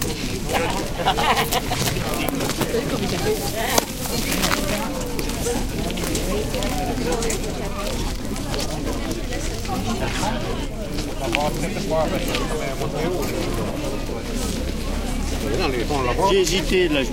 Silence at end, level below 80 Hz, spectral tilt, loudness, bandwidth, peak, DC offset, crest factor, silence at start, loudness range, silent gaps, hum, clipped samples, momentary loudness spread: 0 s; -30 dBFS; -4 dB/octave; -23 LUFS; 17 kHz; 0 dBFS; under 0.1%; 22 dB; 0 s; 4 LU; none; none; under 0.1%; 8 LU